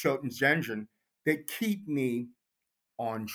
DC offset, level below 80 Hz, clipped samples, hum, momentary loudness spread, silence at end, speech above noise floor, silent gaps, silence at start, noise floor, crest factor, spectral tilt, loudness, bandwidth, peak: under 0.1%; -76 dBFS; under 0.1%; none; 16 LU; 0 s; 54 dB; none; 0 s; -84 dBFS; 22 dB; -5.5 dB/octave; -31 LUFS; over 20 kHz; -10 dBFS